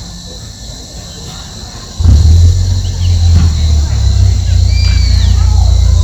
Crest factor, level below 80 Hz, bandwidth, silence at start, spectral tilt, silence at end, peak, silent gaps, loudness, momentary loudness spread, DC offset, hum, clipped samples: 8 dB; -12 dBFS; 8.4 kHz; 0 s; -5.5 dB/octave; 0 s; 0 dBFS; none; -10 LUFS; 18 LU; under 0.1%; none; 0.7%